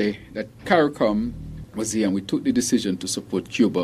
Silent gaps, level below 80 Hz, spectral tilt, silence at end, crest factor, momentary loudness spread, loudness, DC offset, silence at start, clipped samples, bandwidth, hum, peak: none; -48 dBFS; -4.5 dB/octave; 0 s; 20 dB; 13 LU; -23 LUFS; under 0.1%; 0 s; under 0.1%; 15 kHz; none; -2 dBFS